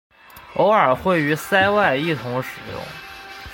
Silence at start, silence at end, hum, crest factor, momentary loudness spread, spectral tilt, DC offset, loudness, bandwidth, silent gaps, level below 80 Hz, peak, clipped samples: 0.35 s; 0 s; none; 18 dB; 18 LU; -5.5 dB/octave; under 0.1%; -19 LUFS; 17 kHz; none; -50 dBFS; -2 dBFS; under 0.1%